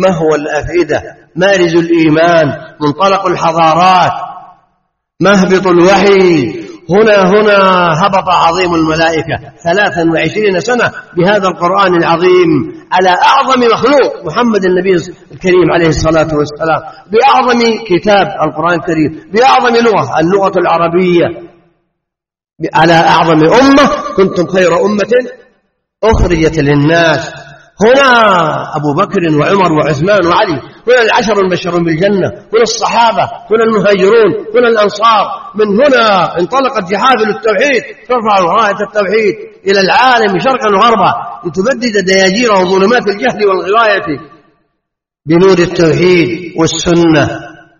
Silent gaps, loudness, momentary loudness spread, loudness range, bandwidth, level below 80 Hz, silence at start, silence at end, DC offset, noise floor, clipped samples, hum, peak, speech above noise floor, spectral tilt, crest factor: none; -9 LUFS; 8 LU; 2 LU; 7.4 kHz; -34 dBFS; 0 s; 0.3 s; under 0.1%; -80 dBFS; 0.1%; none; 0 dBFS; 71 dB; -5.5 dB/octave; 10 dB